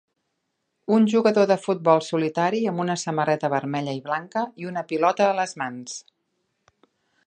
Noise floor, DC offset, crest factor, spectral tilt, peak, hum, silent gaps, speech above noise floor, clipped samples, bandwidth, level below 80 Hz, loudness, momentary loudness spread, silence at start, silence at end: -77 dBFS; under 0.1%; 20 dB; -5.5 dB/octave; -4 dBFS; none; none; 54 dB; under 0.1%; 9.6 kHz; -74 dBFS; -23 LUFS; 12 LU; 0.9 s; 1.25 s